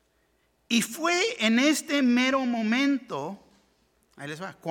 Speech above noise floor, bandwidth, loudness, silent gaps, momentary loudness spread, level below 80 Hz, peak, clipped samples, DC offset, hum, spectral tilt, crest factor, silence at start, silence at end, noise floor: 44 dB; 18 kHz; -25 LUFS; none; 16 LU; -74 dBFS; -8 dBFS; under 0.1%; under 0.1%; none; -3 dB/octave; 18 dB; 0.7 s; 0 s; -69 dBFS